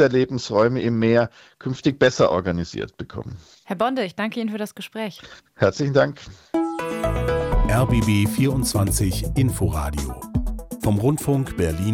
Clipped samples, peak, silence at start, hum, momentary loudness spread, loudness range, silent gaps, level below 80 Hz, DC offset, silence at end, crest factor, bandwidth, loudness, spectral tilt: under 0.1%; -2 dBFS; 0 s; none; 13 LU; 4 LU; none; -32 dBFS; under 0.1%; 0 s; 18 dB; 17 kHz; -22 LUFS; -6 dB/octave